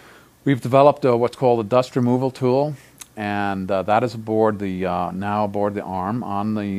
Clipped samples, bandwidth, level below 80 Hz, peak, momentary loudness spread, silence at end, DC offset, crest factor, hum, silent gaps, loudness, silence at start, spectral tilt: under 0.1%; 15.5 kHz; -60 dBFS; 0 dBFS; 10 LU; 0 s; under 0.1%; 20 dB; none; none; -20 LUFS; 0.45 s; -7.5 dB/octave